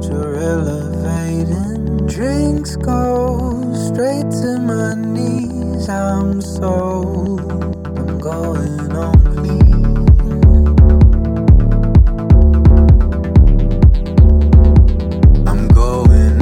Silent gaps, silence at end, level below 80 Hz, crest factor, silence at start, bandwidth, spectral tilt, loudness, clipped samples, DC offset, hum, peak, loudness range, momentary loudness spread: none; 0 s; -14 dBFS; 10 dB; 0 s; 10.5 kHz; -8.5 dB/octave; -13 LUFS; under 0.1%; under 0.1%; none; 0 dBFS; 8 LU; 10 LU